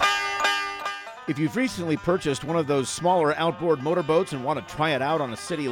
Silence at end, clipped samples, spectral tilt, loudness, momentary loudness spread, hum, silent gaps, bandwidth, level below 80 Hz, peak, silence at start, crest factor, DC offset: 0 s; under 0.1%; -4.5 dB/octave; -25 LUFS; 7 LU; none; none; 19 kHz; -56 dBFS; -8 dBFS; 0 s; 18 dB; under 0.1%